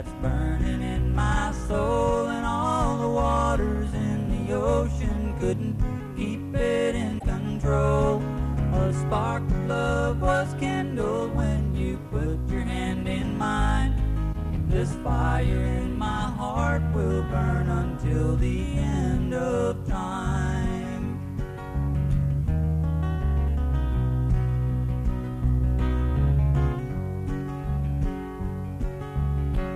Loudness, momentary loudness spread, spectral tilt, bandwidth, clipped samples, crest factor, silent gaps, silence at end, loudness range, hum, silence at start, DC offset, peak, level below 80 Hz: -26 LUFS; 6 LU; -7.5 dB/octave; 12 kHz; under 0.1%; 14 dB; none; 0 s; 2 LU; none; 0 s; under 0.1%; -10 dBFS; -28 dBFS